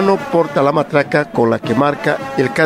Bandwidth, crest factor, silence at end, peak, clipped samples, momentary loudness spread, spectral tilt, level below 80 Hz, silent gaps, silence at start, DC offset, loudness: 15 kHz; 14 dB; 0 s; 0 dBFS; under 0.1%; 4 LU; -6.5 dB/octave; -52 dBFS; none; 0 s; under 0.1%; -15 LUFS